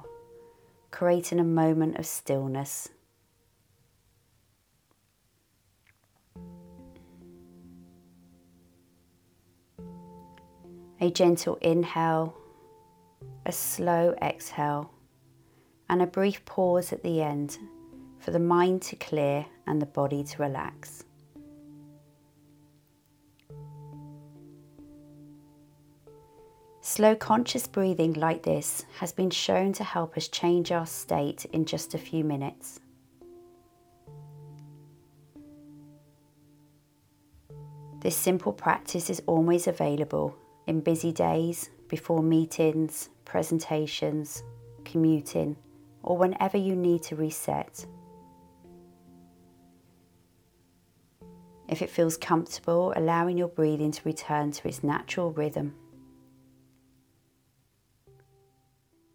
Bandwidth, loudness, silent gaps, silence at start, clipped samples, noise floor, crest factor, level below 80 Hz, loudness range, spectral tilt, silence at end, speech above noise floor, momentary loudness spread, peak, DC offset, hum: 18 kHz; -28 LUFS; none; 0 s; under 0.1%; -70 dBFS; 22 dB; -66 dBFS; 13 LU; -5.5 dB/octave; 3.4 s; 42 dB; 23 LU; -8 dBFS; under 0.1%; none